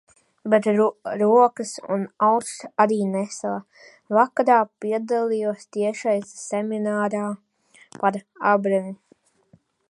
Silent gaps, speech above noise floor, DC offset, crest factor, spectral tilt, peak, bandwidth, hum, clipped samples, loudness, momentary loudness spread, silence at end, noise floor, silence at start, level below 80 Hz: none; 38 dB; under 0.1%; 20 dB; -5.5 dB/octave; -2 dBFS; 11.5 kHz; none; under 0.1%; -22 LUFS; 11 LU; 0.95 s; -60 dBFS; 0.45 s; -76 dBFS